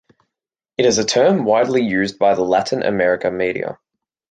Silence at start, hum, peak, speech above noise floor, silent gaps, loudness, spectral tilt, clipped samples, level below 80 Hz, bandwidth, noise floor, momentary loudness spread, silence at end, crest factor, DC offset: 0.8 s; none; -2 dBFS; 68 dB; none; -17 LUFS; -4 dB/octave; under 0.1%; -56 dBFS; 9.4 kHz; -85 dBFS; 7 LU; 0.55 s; 16 dB; under 0.1%